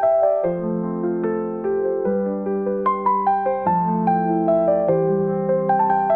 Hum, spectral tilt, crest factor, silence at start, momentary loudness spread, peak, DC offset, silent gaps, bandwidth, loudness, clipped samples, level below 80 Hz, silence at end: none; -12.5 dB/octave; 12 dB; 0 s; 5 LU; -8 dBFS; 0.1%; none; 4 kHz; -20 LUFS; under 0.1%; -58 dBFS; 0 s